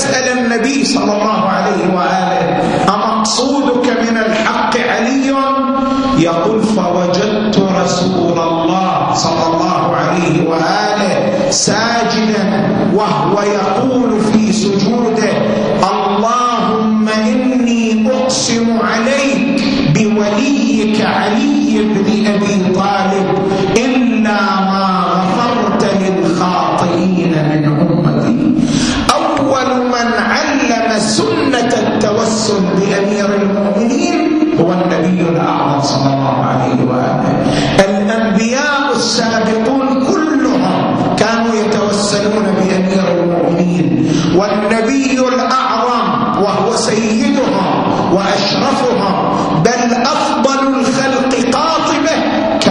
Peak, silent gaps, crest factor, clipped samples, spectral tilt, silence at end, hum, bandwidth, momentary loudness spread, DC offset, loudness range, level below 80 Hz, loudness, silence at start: 0 dBFS; none; 12 dB; under 0.1%; -5 dB/octave; 0 s; none; 10.5 kHz; 1 LU; under 0.1%; 0 LU; -42 dBFS; -12 LUFS; 0 s